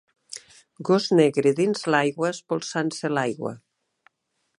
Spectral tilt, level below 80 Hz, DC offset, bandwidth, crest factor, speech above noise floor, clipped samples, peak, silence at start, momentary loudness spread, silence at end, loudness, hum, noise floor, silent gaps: -5 dB/octave; -74 dBFS; under 0.1%; 11 kHz; 20 dB; 51 dB; under 0.1%; -4 dBFS; 0.3 s; 19 LU; 1.05 s; -23 LUFS; none; -73 dBFS; none